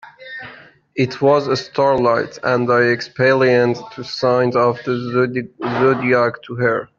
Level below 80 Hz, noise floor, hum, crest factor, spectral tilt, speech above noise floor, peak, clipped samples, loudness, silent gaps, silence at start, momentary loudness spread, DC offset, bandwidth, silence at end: -58 dBFS; -42 dBFS; none; 14 dB; -6.5 dB/octave; 26 dB; -2 dBFS; under 0.1%; -17 LUFS; none; 0.05 s; 13 LU; under 0.1%; 7.2 kHz; 0.15 s